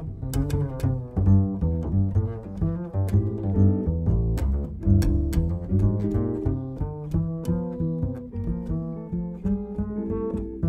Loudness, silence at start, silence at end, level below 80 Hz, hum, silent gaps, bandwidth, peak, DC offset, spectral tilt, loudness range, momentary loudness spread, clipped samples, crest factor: -26 LUFS; 0 s; 0 s; -32 dBFS; none; none; 13 kHz; -8 dBFS; under 0.1%; -9.5 dB/octave; 5 LU; 9 LU; under 0.1%; 16 dB